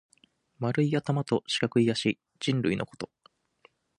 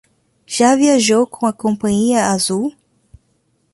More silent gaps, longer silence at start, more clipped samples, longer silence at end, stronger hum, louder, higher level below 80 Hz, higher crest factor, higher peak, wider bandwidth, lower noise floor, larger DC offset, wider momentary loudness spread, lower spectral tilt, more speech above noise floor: neither; about the same, 0.6 s vs 0.5 s; neither; about the same, 0.95 s vs 1.05 s; neither; second, -28 LUFS vs -15 LUFS; second, -64 dBFS vs -54 dBFS; first, 20 dB vs 14 dB; second, -10 dBFS vs -2 dBFS; about the same, 11.5 kHz vs 11.5 kHz; first, -66 dBFS vs -62 dBFS; neither; about the same, 10 LU vs 8 LU; first, -6 dB/octave vs -4 dB/octave; second, 38 dB vs 48 dB